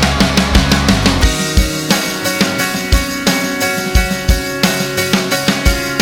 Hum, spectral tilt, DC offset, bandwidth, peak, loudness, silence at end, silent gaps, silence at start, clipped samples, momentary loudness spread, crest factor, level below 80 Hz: none; -4 dB/octave; under 0.1%; 18 kHz; 0 dBFS; -14 LUFS; 0 s; none; 0 s; under 0.1%; 4 LU; 14 dB; -20 dBFS